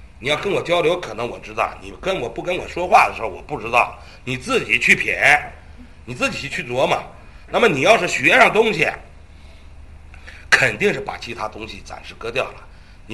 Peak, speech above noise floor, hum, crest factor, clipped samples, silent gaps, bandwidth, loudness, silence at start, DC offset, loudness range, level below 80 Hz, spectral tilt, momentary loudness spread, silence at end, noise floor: 0 dBFS; 23 dB; none; 20 dB; under 0.1%; none; 12.5 kHz; -18 LUFS; 0 s; 0.4%; 5 LU; -44 dBFS; -3.5 dB/octave; 15 LU; 0 s; -42 dBFS